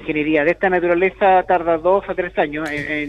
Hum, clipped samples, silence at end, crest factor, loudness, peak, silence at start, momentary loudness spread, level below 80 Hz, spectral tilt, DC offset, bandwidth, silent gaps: none; under 0.1%; 0 s; 14 dB; -17 LUFS; -4 dBFS; 0 s; 7 LU; -46 dBFS; -6.5 dB/octave; under 0.1%; 10.5 kHz; none